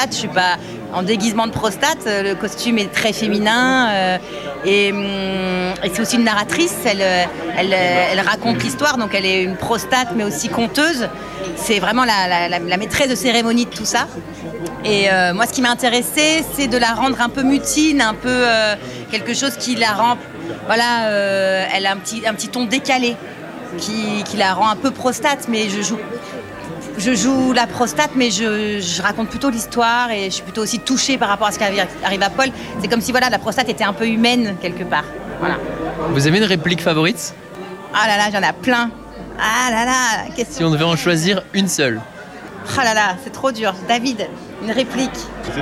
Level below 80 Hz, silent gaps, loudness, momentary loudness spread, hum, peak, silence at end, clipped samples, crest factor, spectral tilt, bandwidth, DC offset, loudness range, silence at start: -46 dBFS; none; -17 LUFS; 10 LU; none; 0 dBFS; 0 s; under 0.1%; 18 dB; -3.5 dB/octave; 16 kHz; under 0.1%; 3 LU; 0 s